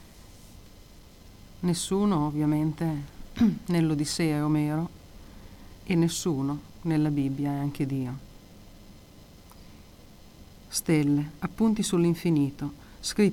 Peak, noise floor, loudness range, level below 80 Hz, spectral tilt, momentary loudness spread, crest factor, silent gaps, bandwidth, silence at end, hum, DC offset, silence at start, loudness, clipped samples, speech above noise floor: -10 dBFS; -50 dBFS; 6 LU; -50 dBFS; -6 dB/octave; 10 LU; 18 dB; none; 17 kHz; 0 s; none; under 0.1%; 0 s; -27 LUFS; under 0.1%; 25 dB